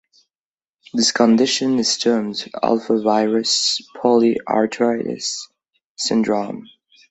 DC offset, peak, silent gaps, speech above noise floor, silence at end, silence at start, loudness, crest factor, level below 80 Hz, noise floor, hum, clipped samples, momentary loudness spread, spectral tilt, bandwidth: under 0.1%; -2 dBFS; 5.85-5.95 s; over 72 dB; 0.5 s; 0.95 s; -18 LUFS; 18 dB; -64 dBFS; under -90 dBFS; none; under 0.1%; 10 LU; -3 dB/octave; 8.4 kHz